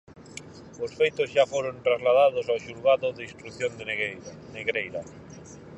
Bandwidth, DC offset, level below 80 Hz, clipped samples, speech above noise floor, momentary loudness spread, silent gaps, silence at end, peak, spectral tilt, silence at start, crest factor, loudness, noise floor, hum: 11 kHz; under 0.1%; -62 dBFS; under 0.1%; 19 dB; 22 LU; none; 0 s; -8 dBFS; -4 dB/octave; 0.15 s; 18 dB; -26 LUFS; -45 dBFS; none